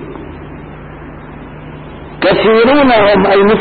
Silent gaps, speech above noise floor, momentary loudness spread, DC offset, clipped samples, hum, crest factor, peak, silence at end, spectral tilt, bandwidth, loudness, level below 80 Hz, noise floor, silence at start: none; 21 dB; 22 LU; under 0.1%; under 0.1%; none; 10 dB; -2 dBFS; 0 s; -11.5 dB/octave; 4.7 kHz; -9 LUFS; -36 dBFS; -29 dBFS; 0 s